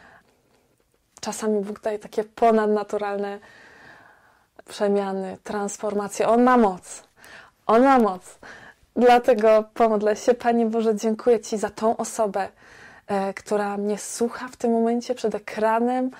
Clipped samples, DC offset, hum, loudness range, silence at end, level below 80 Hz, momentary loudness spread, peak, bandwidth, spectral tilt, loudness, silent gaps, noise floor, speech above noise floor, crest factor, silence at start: under 0.1%; under 0.1%; none; 6 LU; 0 s; -60 dBFS; 15 LU; -8 dBFS; 16 kHz; -5 dB/octave; -22 LUFS; none; -66 dBFS; 44 dB; 14 dB; 1.25 s